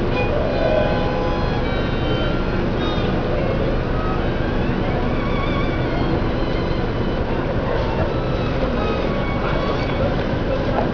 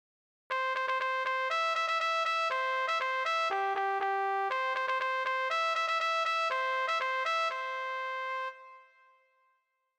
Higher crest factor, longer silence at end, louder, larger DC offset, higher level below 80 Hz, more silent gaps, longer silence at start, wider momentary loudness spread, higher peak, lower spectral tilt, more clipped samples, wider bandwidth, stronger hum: about the same, 16 dB vs 14 dB; second, 0 s vs 1.15 s; first, -21 LUFS vs -31 LUFS; first, 0.2% vs under 0.1%; first, -26 dBFS vs under -90 dBFS; neither; second, 0 s vs 0.5 s; second, 2 LU vs 6 LU; first, -4 dBFS vs -20 dBFS; first, -8 dB/octave vs 0.5 dB/octave; neither; second, 5.4 kHz vs 16.5 kHz; neither